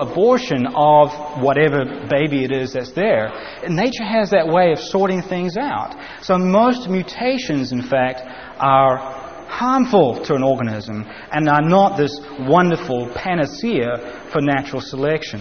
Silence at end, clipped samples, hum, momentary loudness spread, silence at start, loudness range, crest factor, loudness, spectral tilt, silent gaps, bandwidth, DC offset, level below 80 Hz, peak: 0 s; under 0.1%; none; 11 LU; 0 s; 2 LU; 16 dB; -18 LUFS; -5 dB/octave; none; 6.6 kHz; 0.4%; -52 dBFS; -2 dBFS